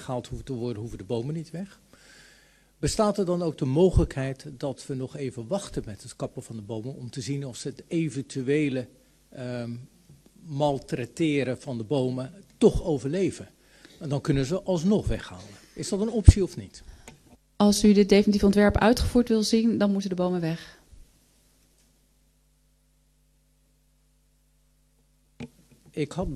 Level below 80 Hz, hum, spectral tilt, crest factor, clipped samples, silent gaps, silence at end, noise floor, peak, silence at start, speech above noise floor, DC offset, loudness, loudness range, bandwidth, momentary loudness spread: -36 dBFS; none; -6.5 dB/octave; 26 dB; under 0.1%; none; 0 s; -65 dBFS; 0 dBFS; 0 s; 40 dB; under 0.1%; -26 LUFS; 12 LU; 13 kHz; 19 LU